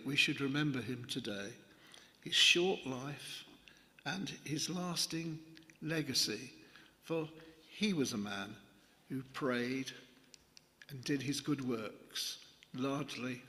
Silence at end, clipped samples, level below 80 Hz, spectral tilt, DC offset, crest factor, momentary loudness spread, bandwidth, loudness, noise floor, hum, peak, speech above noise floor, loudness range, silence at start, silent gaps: 0 s; under 0.1%; -76 dBFS; -3.5 dB/octave; under 0.1%; 24 dB; 19 LU; 15.5 kHz; -37 LUFS; -64 dBFS; none; -14 dBFS; 26 dB; 7 LU; 0 s; none